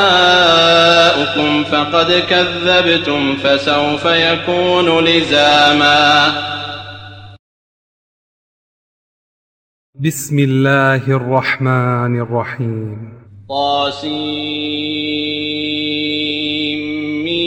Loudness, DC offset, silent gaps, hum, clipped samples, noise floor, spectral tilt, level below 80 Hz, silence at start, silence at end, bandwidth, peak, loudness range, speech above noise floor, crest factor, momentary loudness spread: -13 LUFS; under 0.1%; 7.39-9.93 s; none; under 0.1%; under -90 dBFS; -4.5 dB/octave; -52 dBFS; 0 s; 0 s; 17 kHz; 0 dBFS; 8 LU; over 77 dB; 14 dB; 12 LU